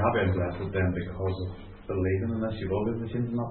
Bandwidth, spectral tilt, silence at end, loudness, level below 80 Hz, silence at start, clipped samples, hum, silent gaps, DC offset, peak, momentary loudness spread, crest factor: 4.3 kHz; -11.5 dB/octave; 0 s; -30 LUFS; -48 dBFS; 0 s; under 0.1%; none; none; under 0.1%; -12 dBFS; 7 LU; 16 dB